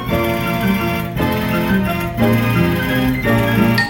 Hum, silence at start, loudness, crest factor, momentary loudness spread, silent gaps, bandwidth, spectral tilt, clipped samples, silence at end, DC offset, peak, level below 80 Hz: none; 0 s; -16 LUFS; 14 dB; 4 LU; none; 17 kHz; -6.5 dB/octave; under 0.1%; 0 s; under 0.1%; -2 dBFS; -34 dBFS